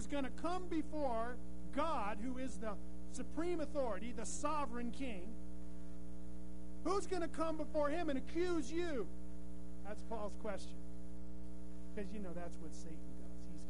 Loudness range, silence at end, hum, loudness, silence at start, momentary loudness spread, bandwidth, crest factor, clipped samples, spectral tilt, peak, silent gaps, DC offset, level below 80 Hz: 8 LU; 0 s; none; -44 LUFS; 0 s; 14 LU; 10.5 kHz; 18 dB; under 0.1%; -5.5 dB/octave; -24 dBFS; none; 1%; -54 dBFS